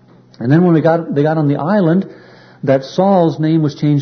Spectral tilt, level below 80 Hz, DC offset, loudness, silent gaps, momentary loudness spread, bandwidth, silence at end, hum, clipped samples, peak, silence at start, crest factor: -9 dB/octave; -58 dBFS; under 0.1%; -14 LUFS; none; 6 LU; 6.4 kHz; 0 s; none; under 0.1%; -2 dBFS; 0.4 s; 12 dB